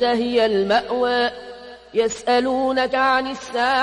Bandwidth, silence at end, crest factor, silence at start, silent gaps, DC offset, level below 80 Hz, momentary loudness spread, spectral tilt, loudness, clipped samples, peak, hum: 11 kHz; 0 s; 14 dB; 0 s; none; under 0.1%; -54 dBFS; 8 LU; -3.5 dB/octave; -20 LUFS; under 0.1%; -6 dBFS; none